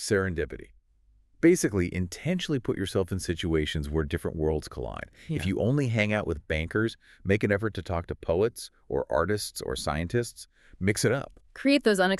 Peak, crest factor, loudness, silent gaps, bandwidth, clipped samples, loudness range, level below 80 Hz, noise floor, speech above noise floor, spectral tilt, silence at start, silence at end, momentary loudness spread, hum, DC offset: -6 dBFS; 22 dB; -28 LUFS; none; 13.5 kHz; under 0.1%; 2 LU; -44 dBFS; -63 dBFS; 35 dB; -5.5 dB/octave; 0 s; 0 s; 10 LU; none; under 0.1%